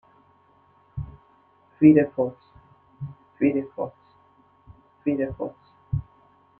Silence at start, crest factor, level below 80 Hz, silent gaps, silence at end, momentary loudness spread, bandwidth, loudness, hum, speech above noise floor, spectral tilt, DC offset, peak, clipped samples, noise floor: 0.95 s; 22 dB; -50 dBFS; none; 0.6 s; 23 LU; 3 kHz; -24 LUFS; none; 38 dB; -12 dB/octave; under 0.1%; -4 dBFS; under 0.1%; -59 dBFS